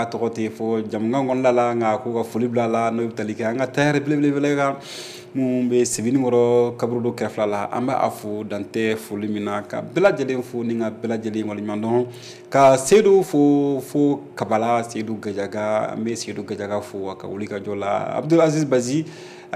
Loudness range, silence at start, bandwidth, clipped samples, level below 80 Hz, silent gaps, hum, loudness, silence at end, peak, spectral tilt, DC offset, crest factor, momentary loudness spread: 6 LU; 0 s; 15 kHz; under 0.1%; -64 dBFS; none; none; -21 LUFS; 0 s; -6 dBFS; -5.5 dB/octave; under 0.1%; 16 dB; 11 LU